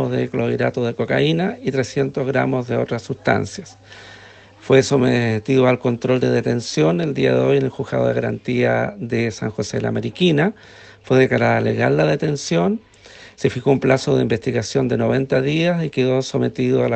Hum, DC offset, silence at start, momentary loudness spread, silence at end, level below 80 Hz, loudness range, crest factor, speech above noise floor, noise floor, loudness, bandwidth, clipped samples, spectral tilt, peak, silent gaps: none; under 0.1%; 0 s; 6 LU; 0 s; -52 dBFS; 3 LU; 18 dB; 25 dB; -43 dBFS; -19 LUFS; 8.8 kHz; under 0.1%; -6.5 dB/octave; -2 dBFS; none